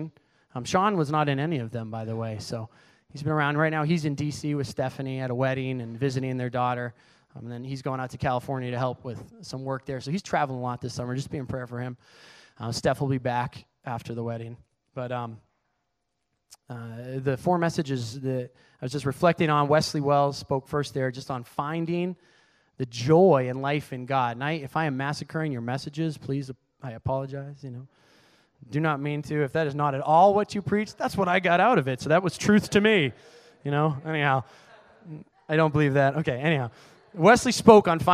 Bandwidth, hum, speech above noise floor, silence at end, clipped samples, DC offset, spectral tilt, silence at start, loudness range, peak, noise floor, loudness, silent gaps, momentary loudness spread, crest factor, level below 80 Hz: 14 kHz; none; 54 dB; 0 s; under 0.1%; under 0.1%; -6 dB/octave; 0 s; 9 LU; 0 dBFS; -79 dBFS; -26 LUFS; none; 17 LU; 26 dB; -58 dBFS